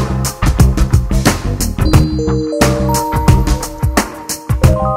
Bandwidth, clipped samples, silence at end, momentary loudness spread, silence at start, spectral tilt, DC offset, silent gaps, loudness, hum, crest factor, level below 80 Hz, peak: 16.5 kHz; 0.3%; 0 s; 5 LU; 0 s; -5.5 dB/octave; under 0.1%; none; -14 LUFS; none; 12 dB; -18 dBFS; 0 dBFS